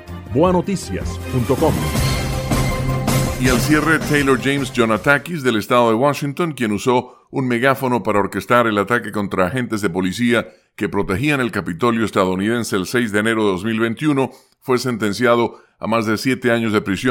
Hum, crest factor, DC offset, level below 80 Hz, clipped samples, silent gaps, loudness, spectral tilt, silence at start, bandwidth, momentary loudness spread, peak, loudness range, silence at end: none; 18 dB; under 0.1%; -36 dBFS; under 0.1%; none; -18 LUFS; -5.5 dB/octave; 0 s; 17 kHz; 7 LU; 0 dBFS; 3 LU; 0 s